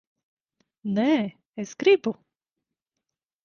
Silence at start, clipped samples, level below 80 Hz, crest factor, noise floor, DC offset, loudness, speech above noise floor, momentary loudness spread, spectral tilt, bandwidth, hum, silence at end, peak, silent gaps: 0.85 s; under 0.1%; -72 dBFS; 20 dB; -86 dBFS; under 0.1%; -24 LUFS; 63 dB; 16 LU; -5.5 dB/octave; 7.2 kHz; none; 1.3 s; -8 dBFS; 1.47-1.53 s